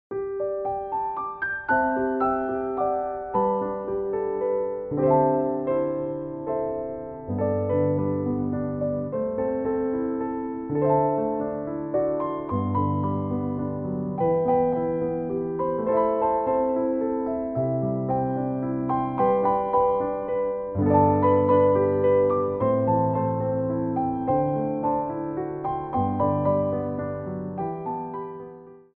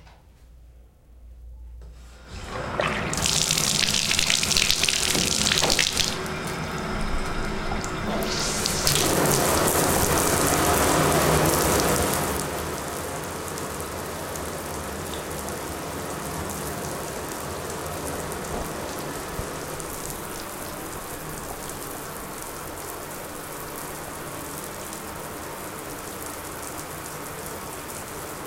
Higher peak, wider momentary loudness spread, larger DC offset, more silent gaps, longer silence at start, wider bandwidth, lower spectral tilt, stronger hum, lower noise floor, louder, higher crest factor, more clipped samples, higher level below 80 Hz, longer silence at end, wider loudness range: about the same, -6 dBFS vs -4 dBFS; second, 9 LU vs 14 LU; neither; neither; about the same, 0.1 s vs 0 s; second, 3.4 kHz vs 17 kHz; first, -9 dB/octave vs -2.5 dB/octave; neither; second, -44 dBFS vs -50 dBFS; about the same, -25 LUFS vs -25 LUFS; second, 18 dB vs 24 dB; neither; second, -54 dBFS vs -40 dBFS; first, 0.15 s vs 0 s; second, 5 LU vs 13 LU